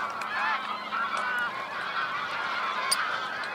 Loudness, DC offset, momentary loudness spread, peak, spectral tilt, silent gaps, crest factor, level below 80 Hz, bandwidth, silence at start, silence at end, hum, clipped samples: -29 LUFS; under 0.1%; 5 LU; -10 dBFS; -0.5 dB/octave; none; 20 dB; -74 dBFS; 16.5 kHz; 0 s; 0 s; none; under 0.1%